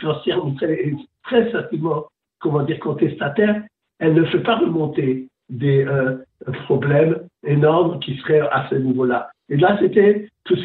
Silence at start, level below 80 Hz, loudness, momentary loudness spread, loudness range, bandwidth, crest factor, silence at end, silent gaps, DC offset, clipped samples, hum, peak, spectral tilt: 0 s; -60 dBFS; -19 LUFS; 10 LU; 4 LU; 4.2 kHz; 16 dB; 0 s; none; under 0.1%; under 0.1%; none; -4 dBFS; -10.5 dB/octave